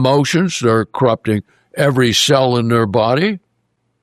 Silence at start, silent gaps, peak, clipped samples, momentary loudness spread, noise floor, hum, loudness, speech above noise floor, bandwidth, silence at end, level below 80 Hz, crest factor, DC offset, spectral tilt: 0 s; none; -2 dBFS; under 0.1%; 8 LU; -66 dBFS; none; -15 LUFS; 52 dB; 14 kHz; 0.65 s; -54 dBFS; 14 dB; under 0.1%; -5 dB/octave